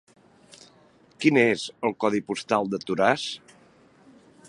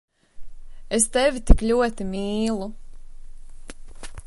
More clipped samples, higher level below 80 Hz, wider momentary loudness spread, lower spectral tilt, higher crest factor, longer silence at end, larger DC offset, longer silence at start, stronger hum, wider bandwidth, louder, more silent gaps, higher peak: neither; second, -68 dBFS vs -28 dBFS; second, 9 LU vs 25 LU; about the same, -5 dB/octave vs -4.5 dB/octave; about the same, 24 dB vs 22 dB; first, 1.1 s vs 0 s; neither; first, 1.2 s vs 0.35 s; neither; about the same, 11.5 kHz vs 11.5 kHz; about the same, -24 LUFS vs -22 LUFS; neither; second, -4 dBFS vs 0 dBFS